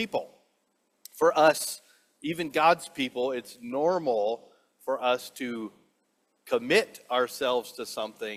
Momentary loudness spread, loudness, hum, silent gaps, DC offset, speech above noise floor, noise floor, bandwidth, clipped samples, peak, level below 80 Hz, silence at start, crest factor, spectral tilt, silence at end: 15 LU; -28 LUFS; none; none; under 0.1%; 46 dB; -73 dBFS; 16 kHz; under 0.1%; -8 dBFS; -74 dBFS; 0 s; 22 dB; -3.5 dB/octave; 0 s